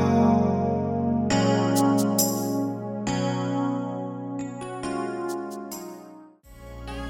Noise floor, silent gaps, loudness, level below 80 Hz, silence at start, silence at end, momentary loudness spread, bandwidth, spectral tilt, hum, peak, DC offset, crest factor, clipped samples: -47 dBFS; none; -25 LUFS; -50 dBFS; 0 s; 0 s; 15 LU; 19 kHz; -5.5 dB/octave; none; -8 dBFS; under 0.1%; 18 dB; under 0.1%